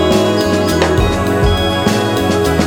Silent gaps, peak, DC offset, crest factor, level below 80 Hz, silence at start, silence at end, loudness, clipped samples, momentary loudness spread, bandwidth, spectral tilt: none; 0 dBFS; under 0.1%; 12 dB; -24 dBFS; 0 s; 0 s; -13 LUFS; under 0.1%; 2 LU; over 20 kHz; -5.5 dB/octave